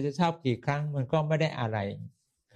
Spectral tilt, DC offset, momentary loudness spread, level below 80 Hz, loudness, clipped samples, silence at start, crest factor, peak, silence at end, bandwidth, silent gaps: -7 dB/octave; under 0.1%; 9 LU; -68 dBFS; -30 LUFS; under 0.1%; 0 s; 16 dB; -14 dBFS; 0.45 s; 9.2 kHz; none